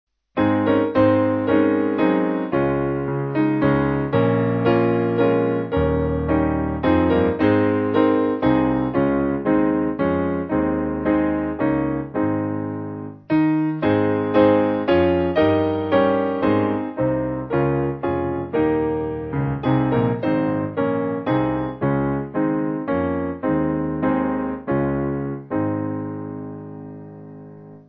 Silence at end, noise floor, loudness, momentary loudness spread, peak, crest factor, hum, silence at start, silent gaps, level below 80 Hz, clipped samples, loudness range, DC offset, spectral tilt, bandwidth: 0.1 s; -40 dBFS; -20 LUFS; 8 LU; -4 dBFS; 16 dB; none; 0.35 s; none; -40 dBFS; under 0.1%; 4 LU; under 0.1%; -11 dB/octave; 5.2 kHz